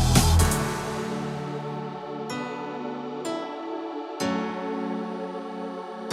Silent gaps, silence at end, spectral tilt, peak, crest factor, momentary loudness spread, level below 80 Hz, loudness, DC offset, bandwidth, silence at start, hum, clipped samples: none; 0 s; -5 dB/octave; -2 dBFS; 24 dB; 13 LU; -34 dBFS; -29 LUFS; under 0.1%; 16 kHz; 0 s; none; under 0.1%